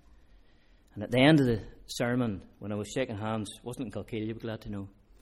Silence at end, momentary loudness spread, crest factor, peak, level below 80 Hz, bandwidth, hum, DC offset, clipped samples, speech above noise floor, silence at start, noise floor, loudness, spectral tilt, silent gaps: 0.35 s; 19 LU; 24 dB; -8 dBFS; -54 dBFS; 15.5 kHz; none; under 0.1%; under 0.1%; 30 dB; 0.95 s; -60 dBFS; -30 LUFS; -6 dB/octave; none